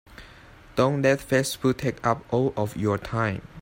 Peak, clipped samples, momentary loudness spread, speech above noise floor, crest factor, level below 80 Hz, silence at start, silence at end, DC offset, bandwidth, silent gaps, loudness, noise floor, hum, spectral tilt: -6 dBFS; under 0.1%; 5 LU; 24 dB; 18 dB; -50 dBFS; 0.1 s; 0 s; under 0.1%; 16.5 kHz; none; -25 LUFS; -49 dBFS; none; -6 dB/octave